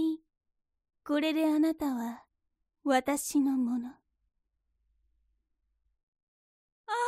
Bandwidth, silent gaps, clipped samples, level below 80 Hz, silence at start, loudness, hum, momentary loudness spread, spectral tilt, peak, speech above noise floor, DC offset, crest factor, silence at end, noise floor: 15.5 kHz; 6.03-6.13 s, 6.23-6.84 s; under 0.1%; -70 dBFS; 0 s; -30 LUFS; none; 14 LU; -3 dB/octave; -14 dBFS; 52 dB; under 0.1%; 20 dB; 0 s; -82 dBFS